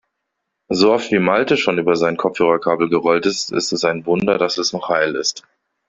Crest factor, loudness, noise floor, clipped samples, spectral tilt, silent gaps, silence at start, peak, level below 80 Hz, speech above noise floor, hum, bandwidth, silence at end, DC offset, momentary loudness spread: 16 dB; -17 LUFS; -76 dBFS; under 0.1%; -4 dB/octave; none; 0.7 s; -2 dBFS; -58 dBFS; 59 dB; none; 7.8 kHz; 0.5 s; under 0.1%; 5 LU